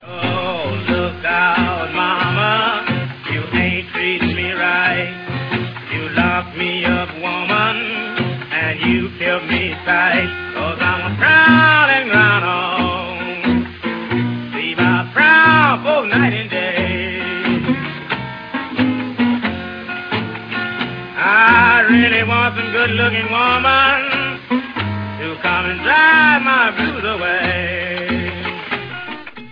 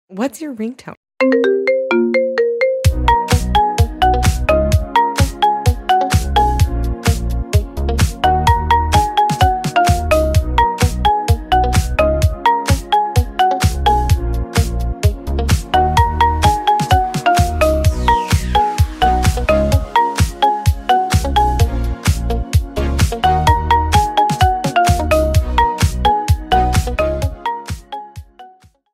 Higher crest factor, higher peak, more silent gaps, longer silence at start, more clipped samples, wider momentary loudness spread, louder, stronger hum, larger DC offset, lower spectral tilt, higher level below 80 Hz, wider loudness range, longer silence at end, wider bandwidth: about the same, 16 dB vs 14 dB; about the same, 0 dBFS vs 0 dBFS; second, none vs 0.97-1.03 s; about the same, 0 s vs 0.1 s; neither; first, 13 LU vs 5 LU; about the same, -15 LUFS vs -15 LUFS; neither; neither; first, -7.5 dB/octave vs -5.5 dB/octave; second, -44 dBFS vs -20 dBFS; first, 6 LU vs 2 LU; second, 0 s vs 0.45 s; second, 5.2 kHz vs 16 kHz